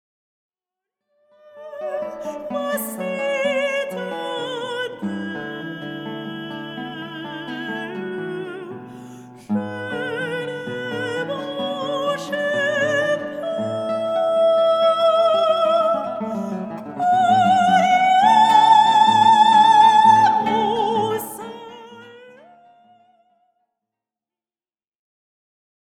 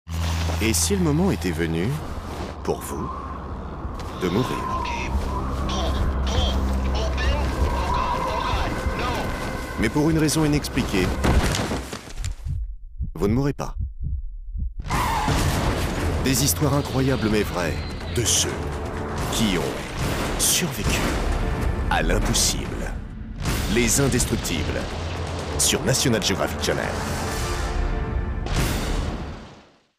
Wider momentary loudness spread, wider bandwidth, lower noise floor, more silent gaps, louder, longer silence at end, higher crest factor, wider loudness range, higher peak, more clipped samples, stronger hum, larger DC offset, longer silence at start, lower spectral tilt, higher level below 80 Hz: first, 18 LU vs 12 LU; about the same, 16.5 kHz vs 15.5 kHz; first, under -90 dBFS vs -49 dBFS; neither; first, -18 LUFS vs -24 LUFS; first, 3.7 s vs 0.35 s; about the same, 18 dB vs 14 dB; first, 16 LU vs 5 LU; first, -2 dBFS vs -8 dBFS; neither; neither; neither; first, 1.55 s vs 0.05 s; about the same, -4.5 dB/octave vs -4 dB/octave; second, -68 dBFS vs -30 dBFS